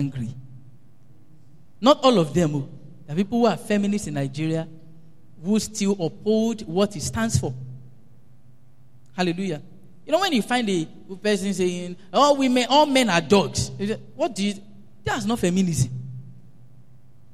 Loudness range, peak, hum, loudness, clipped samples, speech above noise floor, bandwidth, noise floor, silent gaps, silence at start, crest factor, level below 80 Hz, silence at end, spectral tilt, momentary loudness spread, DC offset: 6 LU; -4 dBFS; none; -23 LUFS; under 0.1%; 33 dB; 14.5 kHz; -55 dBFS; none; 0 s; 20 dB; -52 dBFS; 1 s; -5 dB/octave; 17 LU; 0.7%